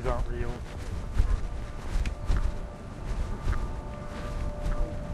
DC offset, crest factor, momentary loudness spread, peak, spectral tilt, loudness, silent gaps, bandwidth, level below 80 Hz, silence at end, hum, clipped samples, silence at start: under 0.1%; 20 dB; 7 LU; -10 dBFS; -6.5 dB/octave; -35 LUFS; none; 11.5 kHz; -30 dBFS; 0 s; none; under 0.1%; 0 s